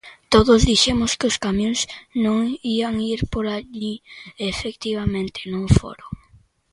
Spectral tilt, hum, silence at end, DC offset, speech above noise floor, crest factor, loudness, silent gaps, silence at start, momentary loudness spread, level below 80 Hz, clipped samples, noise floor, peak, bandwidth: -4.5 dB/octave; none; 0.55 s; under 0.1%; 34 dB; 20 dB; -20 LUFS; none; 0.05 s; 15 LU; -34 dBFS; under 0.1%; -55 dBFS; 0 dBFS; 11.5 kHz